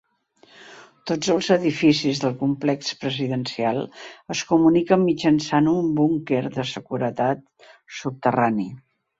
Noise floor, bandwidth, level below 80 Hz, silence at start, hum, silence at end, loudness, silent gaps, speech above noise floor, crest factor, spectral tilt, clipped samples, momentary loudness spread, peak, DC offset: -57 dBFS; 8 kHz; -60 dBFS; 0.6 s; none; 0.4 s; -22 LUFS; none; 36 dB; 20 dB; -5.5 dB/octave; under 0.1%; 12 LU; -2 dBFS; under 0.1%